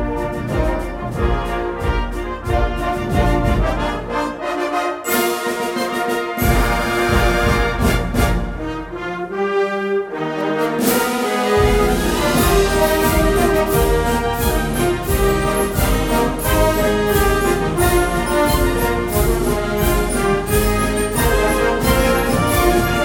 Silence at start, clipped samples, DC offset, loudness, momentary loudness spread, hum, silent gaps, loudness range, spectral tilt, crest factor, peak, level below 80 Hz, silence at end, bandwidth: 0 s; under 0.1%; under 0.1%; -18 LUFS; 7 LU; none; none; 4 LU; -5 dB/octave; 14 dB; -2 dBFS; -24 dBFS; 0 s; 18 kHz